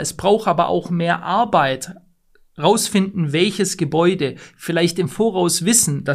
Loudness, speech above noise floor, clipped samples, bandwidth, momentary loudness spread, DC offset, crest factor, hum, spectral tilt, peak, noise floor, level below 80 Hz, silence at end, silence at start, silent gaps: -18 LUFS; 37 dB; under 0.1%; 15.5 kHz; 8 LU; under 0.1%; 16 dB; none; -4 dB/octave; -2 dBFS; -55 dBFS; -54 dBFS; 0 s; 0 s; none